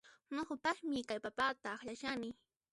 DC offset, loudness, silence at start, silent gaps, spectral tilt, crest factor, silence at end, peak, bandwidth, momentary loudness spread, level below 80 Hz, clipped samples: under 0.1%; -41 LUFS; 0.05 s; none; -3.5 dB/octave; 20 dB; 0.4 s; -20 dBFS; 11.5 kHz; 8 LU; -74 dBFS; under 0.1%